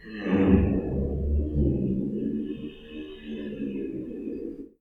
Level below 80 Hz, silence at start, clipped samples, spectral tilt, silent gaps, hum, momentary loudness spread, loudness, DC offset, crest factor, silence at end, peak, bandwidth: -34 dBFS; 0 s; under 0.1%; -10.5 dB/octave; none; none; 17 LU; -28 LUFS; under 0.1%; 22 dB; 0.15 s; -6 dBFS; 4.4 kHz